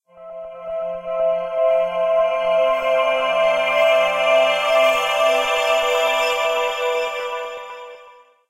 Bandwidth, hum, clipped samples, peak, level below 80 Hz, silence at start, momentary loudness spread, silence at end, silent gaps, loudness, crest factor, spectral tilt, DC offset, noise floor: 16 kHz; none; under 0.1%; -4 dBFS; -58 dBFS; 0.15 s; 15 LU; 0.4 s; none; -18 LUFS; 14 dB; -1 dB/octave; under 0.1%; -47 dBFS